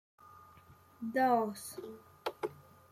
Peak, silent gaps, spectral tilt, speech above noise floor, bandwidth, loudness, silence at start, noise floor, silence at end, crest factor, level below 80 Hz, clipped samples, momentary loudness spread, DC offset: -16 dBFS; none; -4.5 dB/octave; 27 dB; 16 kHz; -35 LUFS; 0.25 s; -60 dBFS; 0.3 s; 22 dB; -78 dBFS; under 0.1%; 18 LU; under 0.1%